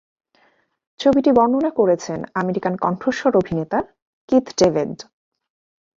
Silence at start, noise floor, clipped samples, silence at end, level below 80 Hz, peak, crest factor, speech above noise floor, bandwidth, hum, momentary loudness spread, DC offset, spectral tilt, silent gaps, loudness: 1 s; -61 dBFS; under 0.1%; 0.95 s; -54 dBFS; -2 dBFS; 18 dB; 43 dB; 7.6 kHz; none; 9 LU; under 0.1%; -6 dB/octave; 4.02-4.28 s; -19 LUFS